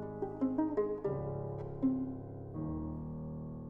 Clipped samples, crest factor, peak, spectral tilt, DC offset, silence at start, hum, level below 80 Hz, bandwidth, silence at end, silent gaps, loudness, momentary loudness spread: under 0.1%; 16 dB; -22 dBFS; -12 dB/octave; under 0.1%; 0 s; none; -54 dBFS; 2.9 kHz; 0 s; none; -38 LUFS; 9 LU